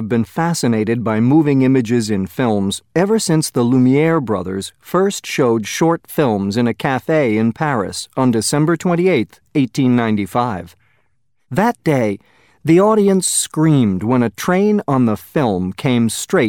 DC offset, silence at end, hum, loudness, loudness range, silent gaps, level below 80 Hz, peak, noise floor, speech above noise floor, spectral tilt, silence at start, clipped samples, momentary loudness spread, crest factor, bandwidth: under 0.1%; 0 s; none; -16 LUFS; 3 LU; none; -54 dBFS; -2 dBFS; -68 dBFS; 53 dB; -5.5 dB/octave; 0 s; under 0.1%; 7 LU; 14 dB; 17.5 kHz